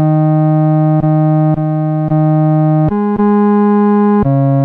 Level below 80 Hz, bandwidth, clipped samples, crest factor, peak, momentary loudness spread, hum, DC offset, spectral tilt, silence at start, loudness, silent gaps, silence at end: -40 dBFS; 3.1 kHz; under 0.1%; 8 dB; -4 dBFS; 3 LU; none; under 0.1%; -13 dB/octave; 0 s; -11 LUFS; none; 0 s